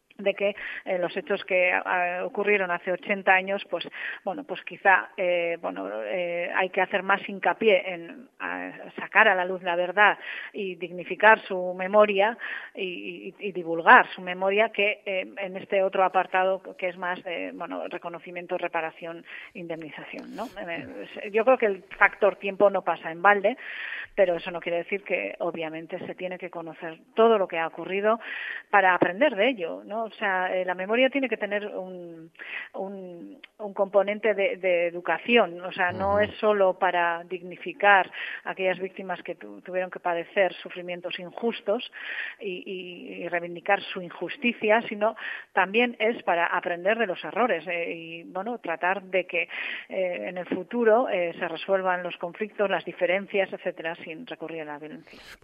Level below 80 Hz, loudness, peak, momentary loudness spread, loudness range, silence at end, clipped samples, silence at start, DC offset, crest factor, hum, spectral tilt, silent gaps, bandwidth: -70 dBFS; -26 LUFS; -2 dBFS; 15 LU; 7 LU; 0.1 s; under 0.1%; 0.2 s; under 0.1%; 24 dB; none; -6.5 dB/octave; none; 5.4 kHz